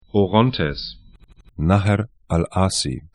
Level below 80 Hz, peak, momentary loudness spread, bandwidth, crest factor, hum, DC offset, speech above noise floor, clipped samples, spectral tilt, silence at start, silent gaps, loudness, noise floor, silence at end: -38 dBFS; 0 dBFS; 8 LU; 11.5 kHz; 20 dB; none; under 0.1%; 29 dB; under 0.1%; -5.5 dB/octave; 0.15 s; none; -20 LUFS; -48 dBFS; 0.15 s